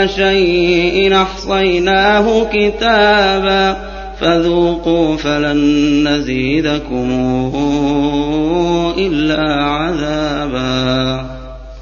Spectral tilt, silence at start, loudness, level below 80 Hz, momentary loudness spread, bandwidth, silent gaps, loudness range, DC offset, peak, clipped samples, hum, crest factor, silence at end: -5.5 dB/octave; 0 s; -13 LUFS; -30 dBFS; 7 LU; 7.2 kHz; none; 4 LU; under 0.1%; 0 dBFS; under 0.1%; none; 14 dB; 0 s